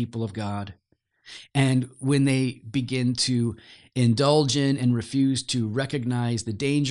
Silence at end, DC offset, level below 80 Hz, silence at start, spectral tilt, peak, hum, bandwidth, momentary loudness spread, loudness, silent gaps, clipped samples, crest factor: 0 s; under 0.1%; -60 dBFS; 0 s; -5.5 dB/octave; -6 dBFS; none; 11 kHz; 11 LU; -24 LUFS; none; under 0.1%; 18 dB